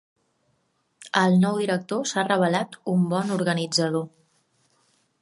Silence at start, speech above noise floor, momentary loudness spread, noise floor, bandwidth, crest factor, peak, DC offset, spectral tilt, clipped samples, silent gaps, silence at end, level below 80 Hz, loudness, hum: 1 s; 48 dB; 7 LU; -71 dBFS; 11.5 kHz; 20 dB; -4 dBFS; under 0.1%; -5 dB/octave; under 0.1%; none; 1.15 s; -72 dBFS; -23 LUFS; none